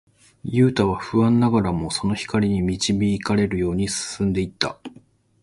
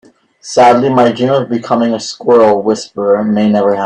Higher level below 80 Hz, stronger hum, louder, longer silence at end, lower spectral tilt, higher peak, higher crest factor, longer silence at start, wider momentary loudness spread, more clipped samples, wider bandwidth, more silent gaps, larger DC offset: first, -42 dBFS vs -54 dBFS; neither; second, -21 LUFS vs -11 LUFS; first, 0.55 s vs 0 s; about the same, -5.5 dB/octave vs -5.5 dB/octave; about the same, -2 dBFS vs 0 dBFS; first, 20 dB vs 10 dB; about the same, 0.45 s vs 0.45 s; about the same, 8 LU vs 8 LU; neither; first, 11.5 kHz vs 10 kHz; neither; neither